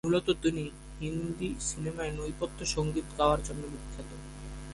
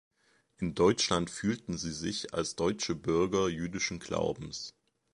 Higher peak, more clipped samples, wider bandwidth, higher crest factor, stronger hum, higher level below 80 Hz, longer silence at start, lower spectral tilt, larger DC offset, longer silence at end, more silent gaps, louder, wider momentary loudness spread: about the same, -12 dBFS vs -12 dBFS; neither; about the same, 11.5 kHz vs 11.5 kHz; about the same, 20 dB vs 20 dB; neither; first, -44 dBFS vs -56 dBFS; second, 0.05 s vs 0.6 s; about the same, -5 dB/octave vs -4.5 dB/octave; neither; second, 0 s vs 0.45 s; neither; about the same, -33 LUFS vs -32 LUFS; first, 15 LU vs 11 LU